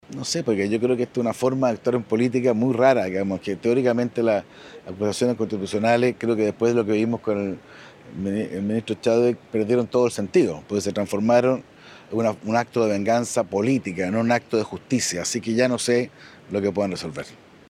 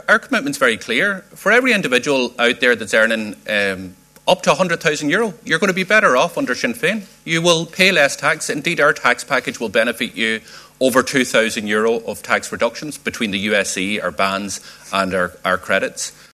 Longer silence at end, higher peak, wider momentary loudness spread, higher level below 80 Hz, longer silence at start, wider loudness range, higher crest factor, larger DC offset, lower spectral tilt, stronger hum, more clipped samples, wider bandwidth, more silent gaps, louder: about the same, 0.35 s vs 0.3 s; second, -4 dBFS vs 0 dBFS; about the same, 7 LU vs 8 LU; about the same, -62 dBFS vs -58 dBFS; about the same, 0.1 s vs 0.1 s; about the same, 2 LU vs 4 LU; about the same, 18 dB vs 18 dB; neither; first, -5.5 dB/octave vs -3 dB/octave; neither; neither; about the same, 14.5 kHz vs 14 kHz; neither; second, -23 LUFS vs -17 LUFS